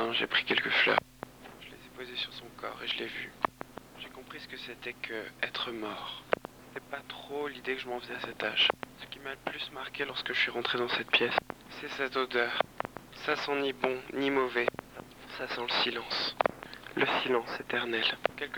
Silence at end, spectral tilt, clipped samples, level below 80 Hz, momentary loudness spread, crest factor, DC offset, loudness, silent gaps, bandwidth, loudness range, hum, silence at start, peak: 0 s; -3.5 dB/octave; under 0.1%; -64 dBFS; 18 LU; 26 dB; under 0.1%; -32 LUFS; none; over 20 kHz; 7 LU; none; 0 s; -8 dBFS